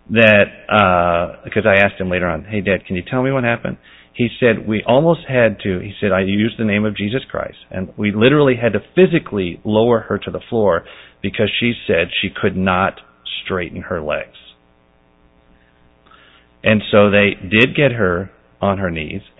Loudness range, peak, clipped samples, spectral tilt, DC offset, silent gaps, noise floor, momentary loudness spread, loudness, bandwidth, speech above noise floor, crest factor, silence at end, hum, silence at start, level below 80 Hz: 6 LU; 0 dBFS; under 0.1%; -8.5 dB/octave; under 0.1%; none; -54 dBFS; 12 LU; -16 LUFS; 4 kHz; 38 dB; 16 dB; 0.2 s; none; 0.1 s; -42 dBFS